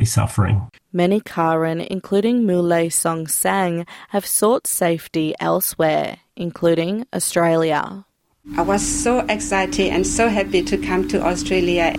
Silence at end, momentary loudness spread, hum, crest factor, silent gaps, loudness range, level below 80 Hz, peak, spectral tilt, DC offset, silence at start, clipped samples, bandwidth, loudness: 0 s; 6 LU; none; 16 dB; none; 1 LU; -40 dBFS; -4 dBFS; -4.5 dB/octave; under 0.1%; 0 s; under 0.1%; 16.5 kHz; -19 LUFS